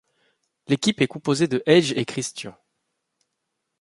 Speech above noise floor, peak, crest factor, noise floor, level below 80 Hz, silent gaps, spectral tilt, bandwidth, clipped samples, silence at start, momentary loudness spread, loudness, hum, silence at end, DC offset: 57 dB; -2 dBFS; 22 dB; -79 dBFS; -64 dBFS; none; -5 dB/octave; 11.5 kHz; under 0.1%; 0.7 s; 13 LU; -22 LUFS; none; 1.3 s; under 0.1%